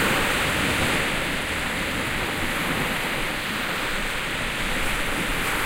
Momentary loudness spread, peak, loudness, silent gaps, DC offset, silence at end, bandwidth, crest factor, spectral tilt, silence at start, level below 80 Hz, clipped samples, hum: 4 LU; -10 dBFS; -24 LUFS; none; under 0.1%; 0 s; 16 kHz; 14 dB; -3 dB/octave; 0 s; -36 dBFS; under 0.1%; none